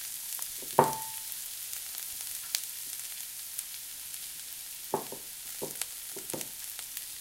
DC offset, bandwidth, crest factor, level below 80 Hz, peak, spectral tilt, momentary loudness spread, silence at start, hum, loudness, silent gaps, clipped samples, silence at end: under 0.1%; 17 kHz; 34 dB; -70 dBFS; -4 dBFS; -2 dB/octave; 9 LU; 0 s; none; -35 LUFS; none; under 0.1%; 0 s